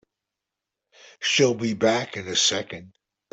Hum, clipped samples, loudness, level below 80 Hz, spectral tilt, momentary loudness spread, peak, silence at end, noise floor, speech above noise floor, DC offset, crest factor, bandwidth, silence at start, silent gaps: none; under 0.1%; -22 LUFS; -66 dBFS; -2.5 dB/octave; 12 LU; -8 dBFS; 0.45 s; -86 dBFS; 62 dB; under 0.1%; 20 dB; 8.4 kHz; 1.2 s; none